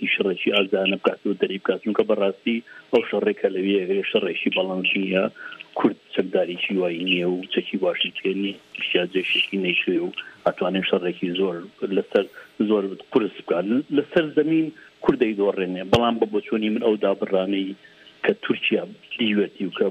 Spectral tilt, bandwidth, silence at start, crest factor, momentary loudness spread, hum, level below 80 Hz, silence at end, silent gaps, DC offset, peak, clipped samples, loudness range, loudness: -6.5 dB/octave; 8.2 kHz; 0 s; 16 dB; 6 LU; none; -60 dBFS; 0 s; none; under 0.1%; -6 dBFS; under 0.1%; 2 LU; -23 LUFS